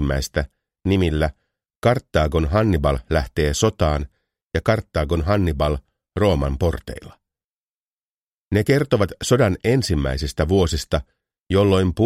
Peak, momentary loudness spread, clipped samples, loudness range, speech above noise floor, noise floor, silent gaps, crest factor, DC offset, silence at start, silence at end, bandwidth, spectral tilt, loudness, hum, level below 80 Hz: -2 dBFS; 9 LU; under 0.1%; 3 LU; over 71 dB; under -90 dBFS; 1.76-1.82 s, 4.43-4.50 s, 7.44-8.49 s; 18 dB; under 0.1%; 0 s; 0 s; 15.5 kHz; -6 dB/octave; -21 LUFS; none; -30 dBFS